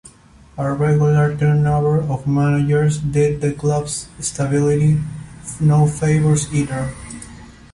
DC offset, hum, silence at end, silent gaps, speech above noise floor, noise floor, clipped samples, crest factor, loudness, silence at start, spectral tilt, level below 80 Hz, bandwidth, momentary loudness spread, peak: under 0.1%; none; 0.2 s; none; 30 dB; -46 dBFS; under 0.1%; 12 dB; -17 LUFS; 0.05 s; -7 dB/octave; -42 dBFS; 11.5 kHz; 15 LU; -6 dBFS